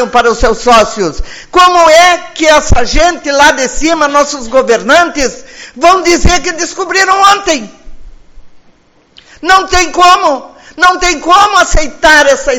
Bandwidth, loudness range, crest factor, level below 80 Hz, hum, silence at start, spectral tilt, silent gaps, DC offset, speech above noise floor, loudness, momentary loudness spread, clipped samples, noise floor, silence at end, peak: 20 kHz; 4 LU; 8 dB; -22 dBFS; none; 0 s; -2.5 dB/octave; none; under 0.1%; 38 dB; -7 LUFS; 10 LU; 4%; -45 dBFS; 0 s; 0 dBFS